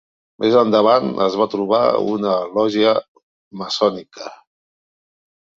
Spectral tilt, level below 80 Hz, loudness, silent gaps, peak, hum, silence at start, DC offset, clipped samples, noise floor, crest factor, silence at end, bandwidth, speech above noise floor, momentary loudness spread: -5.5 dB/octave; -62 dBFS; -17 LUFS; 3.08-3.15 s, 3.23-3.51 s; -2 dBFS; none; 0.4 s; under 0.1%; under 0.1%; under -90 dBFS; 18 dB; 1.2 s; 7.6 kHz; over 73 dB; 18 LU